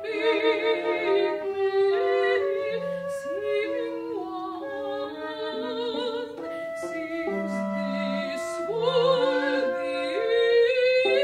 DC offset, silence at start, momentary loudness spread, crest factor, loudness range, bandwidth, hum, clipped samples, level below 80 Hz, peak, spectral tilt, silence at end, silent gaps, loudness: under 0.1%; 0 s; 11 LU; 14 dB; 7 LU; 12.5 kHz; none; under 0.1%; -70 dBFS; -10 dBFS; -5 dB/octave; 0 s; none; -26 LUFS